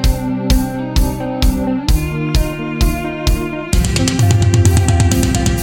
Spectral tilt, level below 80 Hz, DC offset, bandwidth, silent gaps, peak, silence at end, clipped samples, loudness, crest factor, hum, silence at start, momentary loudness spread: -5.5 dB/octave; -18 dBFS; under 0.1%; 17.5 kHz; none; 0 dBFS; 0 s; under 0.1%; -15 LUFS; 14 dB; none; 0 s; 7 LU